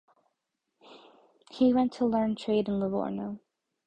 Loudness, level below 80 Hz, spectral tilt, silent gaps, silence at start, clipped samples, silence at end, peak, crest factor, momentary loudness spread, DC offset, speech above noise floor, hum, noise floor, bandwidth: -28 LUFS; -64 dBFS; -7.5 dB/octave; none; 0.9 s; under 0.1%; 0.5 s; -14 dBFS; 16 dB; 15 LU; under 0.1%; 55 dB; none; -83 dBFS; 8.6 kHz